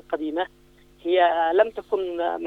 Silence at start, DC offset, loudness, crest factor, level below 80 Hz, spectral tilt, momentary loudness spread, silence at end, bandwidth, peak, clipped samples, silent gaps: 0.1 s; under 0.1%; -23 LUFS; 18 dB; -60 dBFS; -5.5 dB/octave; 11 LU; 0 s; 5 kHz; -6 dBFS; under 0.1%; none